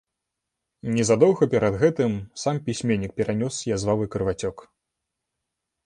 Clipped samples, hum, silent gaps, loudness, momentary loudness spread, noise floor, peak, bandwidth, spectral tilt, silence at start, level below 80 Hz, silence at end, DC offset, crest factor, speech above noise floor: under 0.1%; none; none; -23 LUFS; 9 LU; -83 dBFS; -4 dBFS; 11 kHz; -6 dB/octave; 0.85 s; -50 dBFS; 1.25 s; under 0.1%; 20 dB; 60 dB